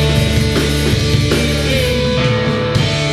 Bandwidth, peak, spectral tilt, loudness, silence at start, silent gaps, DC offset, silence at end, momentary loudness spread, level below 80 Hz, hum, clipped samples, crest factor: 15 kHz; -2 dBFS; -5 dB/octave; -14 LUFS; 0 s; none; under 0.1%; 0 s; 1 LU; -24 dBFS; none; under 0.1%; 12 dB